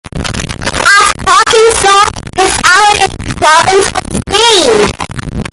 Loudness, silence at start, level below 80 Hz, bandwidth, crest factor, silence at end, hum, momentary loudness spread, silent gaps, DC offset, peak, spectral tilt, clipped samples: -7 LUFS; 0.15 s; -28 dBFS; 16 kHz; 8 dB; 0.05 s; none; 11 LU; none; under 0.1%; 0 dBFS; -2 dB/octave; 0.3%